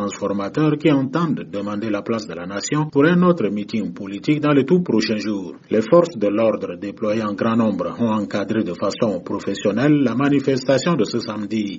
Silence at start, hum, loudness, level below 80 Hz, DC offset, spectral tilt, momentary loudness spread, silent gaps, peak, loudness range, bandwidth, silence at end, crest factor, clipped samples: 0 s; none; -20 LUFS; -60 dBFS; under 0.1%; -6 dB/octave; 9 LU; none; -4 dBFS; 2 LU; 8 kHz; 0 s; 16 dB; under 0.1%